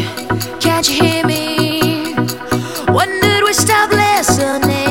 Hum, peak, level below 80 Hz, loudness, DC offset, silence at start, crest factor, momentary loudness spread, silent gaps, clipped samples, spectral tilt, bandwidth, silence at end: none; 0 dBFS; -42 dBFS; -13 LUFS; 0.7%; 0 s; 14 dB; 8 LU; none; under 0.1%; -3.5 dB/octave; 17 kHz; 0 s